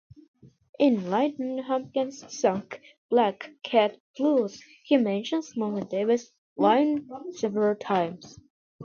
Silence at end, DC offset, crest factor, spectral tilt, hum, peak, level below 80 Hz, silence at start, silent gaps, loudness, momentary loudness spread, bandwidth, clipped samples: 0 s; under 0.1%; 20 dB; -5.5 dB/octave; none; -8 dBFS; -72 dBFS; 0.45 s; 0.69-0.73 s, 2.98-3.09 s, 4.00-4.14 s, 6.38-6.56 s, 8.50-8.79 s; -26 LUFS; 11 LU; 7.4 kHz; under 0.1%